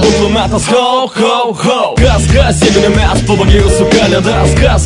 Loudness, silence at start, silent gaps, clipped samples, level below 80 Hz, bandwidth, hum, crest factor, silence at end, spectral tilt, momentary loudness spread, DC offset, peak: -9 LUFS; 0 s; none; 0.9%; -16 dBFS; 11 kHz; none; 8 dB; 0 s; -5 dB/octave; 3 LU; under 0.1%; 0 dBFS